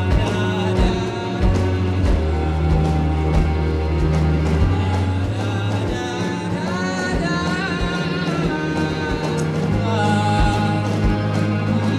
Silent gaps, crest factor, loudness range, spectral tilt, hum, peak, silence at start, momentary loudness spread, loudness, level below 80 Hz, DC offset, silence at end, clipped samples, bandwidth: none; 14 dB; 2 LU; -6.5 dB/octave; none; -6 dBFS; 0 s; 4 LU; -20 LUFS; -26 dBFS; under 0.1%; 0 s; under 0.1%; 11.5 kHz